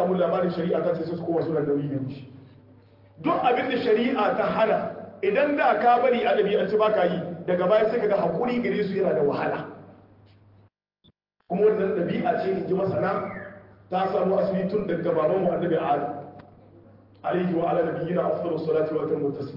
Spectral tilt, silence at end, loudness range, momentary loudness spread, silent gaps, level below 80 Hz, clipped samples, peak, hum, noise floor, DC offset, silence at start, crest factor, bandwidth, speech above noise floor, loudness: -9.5 dB/octave; 0 s; 5 LU; 9 LU; none; -64 dBFS; under 0.1%; -8 dBFS; none; -63 dBFS; under 0.1%; 0 s; 16 dB; 5.8 kHz; 40 dB; -24 LUFS